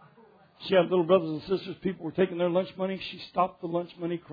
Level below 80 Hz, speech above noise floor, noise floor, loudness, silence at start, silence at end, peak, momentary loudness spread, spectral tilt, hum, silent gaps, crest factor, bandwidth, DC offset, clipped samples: -66 dBFS; 30 dB; -58 dBFS; -28 LUFS; 0.6 s; 0 s; -8 dBFS; 10 LU; -8.5 dB/octave; none; none; 20 dB; 5 kHz; under 0.1%; under 0.1%